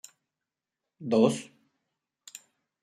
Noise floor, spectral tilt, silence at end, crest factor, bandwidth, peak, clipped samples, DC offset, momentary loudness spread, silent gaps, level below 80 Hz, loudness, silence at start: -89 dBFS; -6 dB/octave; 0.45 s; 24 dB; 14.5 kHz; -8 dBFS; under 0.1%; under 0.1%; 23 LU; none; -76 dBFS; -26 LUFS; 1 s